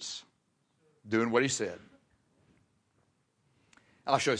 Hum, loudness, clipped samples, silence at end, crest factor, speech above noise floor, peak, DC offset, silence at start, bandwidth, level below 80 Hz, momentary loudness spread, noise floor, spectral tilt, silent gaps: none; -31 LUFS; under 0.1%; 0 s; 24 dB; 46 dB; -10 dBFS; under 0.1%; 0 s; 10.5 kHz; -76 dBFS; 16 LU; -75 dBFS; -3.5 dB/octave; none